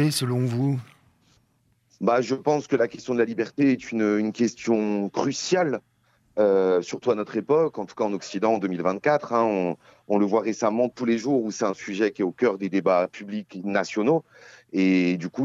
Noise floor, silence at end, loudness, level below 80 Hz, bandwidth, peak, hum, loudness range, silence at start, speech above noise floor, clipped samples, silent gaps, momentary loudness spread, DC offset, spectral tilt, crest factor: -66 dBFS; 0 s; -24 LUFS; -72 dBFS; 14.5 kHz; -8 dBFS; none; 2 LU; 0 s; 43 dB; under 0.1%; none; 6 LU; under 0.1%; -6 dB/octave; 16 dB